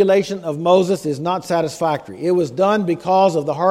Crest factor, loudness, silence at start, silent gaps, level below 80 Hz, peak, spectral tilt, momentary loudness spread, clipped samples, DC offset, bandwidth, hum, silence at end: 16 dB; -18 LUFS; 0 s; none; -60 dBFS; 0 dBFS; -6 dB/octave; 6 LU; under 0.1%; under 0.1%; 15 kHz; none; 0 s